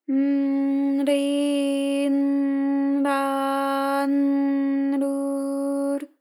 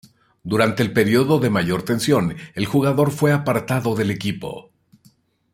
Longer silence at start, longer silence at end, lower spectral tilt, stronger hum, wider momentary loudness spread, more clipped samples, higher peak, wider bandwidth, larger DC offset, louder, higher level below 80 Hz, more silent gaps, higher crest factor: second, 0.1 s vs 0.45 s; second, 0.15 s vs 0.9 s; second, -3.5 dB/octave vs -6 dB/octave; neither; second, 4 LU vs 10 LU; neither; second, -10 dBFS vs -2 dBFS; second, 12.5 kHz vs 16.5 kHz; neither; second, -23 LUFS vs -19 LUFS; second, under -90 dBFS vs -54 dBFS; neither; second, 12 dB vs 18 dB